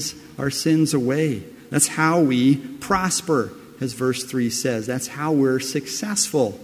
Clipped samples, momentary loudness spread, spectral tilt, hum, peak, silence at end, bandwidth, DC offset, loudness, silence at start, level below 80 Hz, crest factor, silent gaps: under 0.1%; 9 LU; -4.5 dB/octave; none; -2 dBFS; 0 s; 16 kHz; under 0.1%; -21 LUFS; 0 s; -54 dBFS; 18 dB; none